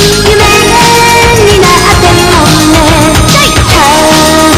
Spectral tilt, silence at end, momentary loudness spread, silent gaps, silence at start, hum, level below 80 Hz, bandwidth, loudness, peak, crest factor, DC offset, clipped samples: -3.5 dB/octave; 0 s; 1 LU; none; 0 s; none; -16 dBFS; 16 kHz; -3 LUFS; 0 dBFS; 4 dB; under 0.1%; 10%